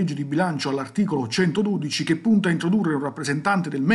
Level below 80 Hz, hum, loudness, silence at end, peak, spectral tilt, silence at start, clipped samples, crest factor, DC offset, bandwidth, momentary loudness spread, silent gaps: -66 dBFS; none; -23 LUFS; 0 s; -6 dBFS; -6 dB/octave; 0 s; under 0.1%; 16 dB; under 0.1%; 12 kHz; 5 LU; none